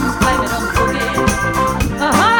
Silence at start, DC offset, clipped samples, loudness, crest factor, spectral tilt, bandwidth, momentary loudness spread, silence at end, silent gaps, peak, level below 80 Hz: 0 s; under 0.1%; under 0.1%; -16 LUFS; 14 dB; -4.5 dB/octave; over 20 kHz; 2 LU; 0 s; none; 0 dBFS; -26 dBFS